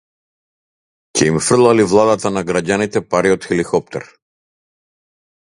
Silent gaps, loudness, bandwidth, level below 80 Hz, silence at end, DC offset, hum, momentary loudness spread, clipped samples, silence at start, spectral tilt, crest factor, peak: none; -15 LUFS; 11.5 kHz; -48 dBFS; 1.4 s; under 0.1%; none; 9 LU; under 0.1%; 1.15 s; -4.5 dB/octave; 18 dB; 0 dBFS